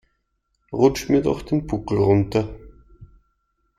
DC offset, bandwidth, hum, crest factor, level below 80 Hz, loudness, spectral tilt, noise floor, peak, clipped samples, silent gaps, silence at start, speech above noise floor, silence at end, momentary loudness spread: under 0.1%; 15 kHz; none; 20 dB; -44 dBFS; -21 LUFS; -7 dB/octave; -72 dBFS; -4 dBFS; under 0.1%; none; 0.7 s; 52 dB; 0.75 s; 7 LU